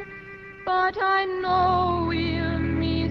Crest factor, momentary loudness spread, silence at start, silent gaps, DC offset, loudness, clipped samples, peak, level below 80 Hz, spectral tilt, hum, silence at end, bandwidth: 14 dB; 14 LU; 0 s; none; under 0.1%; -23 LUFS; under 0.1%; -10 dBFS; -40 dBFS; -8 dB/octave; none; 0 s; 6.2 kHz